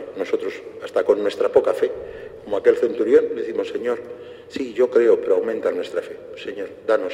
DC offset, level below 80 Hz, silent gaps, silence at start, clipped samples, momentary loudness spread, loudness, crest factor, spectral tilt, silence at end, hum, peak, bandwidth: under 0.1%; -60 dBFS; none; 0 s; under 0.1%; 16 LU; -21 LUFS; 18 dB; -5.5 dB/octave; 0 s; none; -2 dBFS; 10 kHz